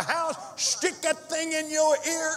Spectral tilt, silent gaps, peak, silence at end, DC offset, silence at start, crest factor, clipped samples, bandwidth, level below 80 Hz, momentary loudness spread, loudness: -1 dB/octave; none; -10 dBFS; 0 s; under 0.1%; 0 s; 16 dB; under 0.1%; 16 kHz; -82 dBFS; 5 LU; -26 LUFS